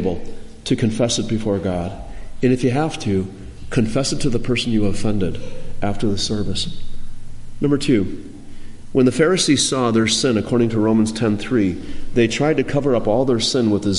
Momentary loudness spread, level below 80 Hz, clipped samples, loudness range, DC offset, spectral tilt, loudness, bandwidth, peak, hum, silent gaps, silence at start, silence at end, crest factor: 15 LU; -32 dBFS; under 0.1%; 6 LU; under 0.1%; -5 dB/octave; -19 LUFS; 11.5 kHz; -4 dBFS; none; none; 0 s; 0 s; 16 dB